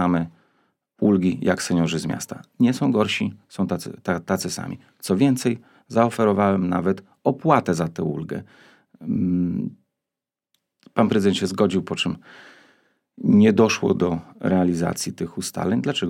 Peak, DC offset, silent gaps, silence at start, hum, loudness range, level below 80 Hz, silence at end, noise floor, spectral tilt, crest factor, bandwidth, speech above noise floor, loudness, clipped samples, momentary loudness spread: -2 dBFS; under 0.1%; none; 0 s; none; 4 LU; -58 dBFS; 0 s; -88 dBFS; -6 dB/octave; 20 dB; 16.5 kHz; 67 dB; -22 LUFS; under 0.1%; 10 LU